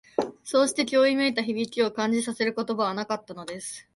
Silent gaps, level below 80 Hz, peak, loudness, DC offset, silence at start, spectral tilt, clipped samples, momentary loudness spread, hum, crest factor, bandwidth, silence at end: none; -70 dBFS; -8 dBFS; -26 LUFS; under 0.1%; 0.2 s; -3.5 dB/octave; under 0.1%; 12 LU; none; 18 dB; 11.5 kHz; 0.15 s